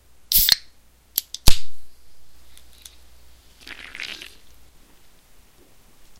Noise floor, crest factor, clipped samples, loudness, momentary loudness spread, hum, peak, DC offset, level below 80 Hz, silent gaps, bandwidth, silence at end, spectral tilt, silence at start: -51 dBFS; 22 dB; under 0.1%; -21 LUFS; 30 LU; none; 0 dBFS; under 0.1%; -32 dBFS; none; 16.5 kHz; 2.05 s; -1 dB/octave; 0.3 s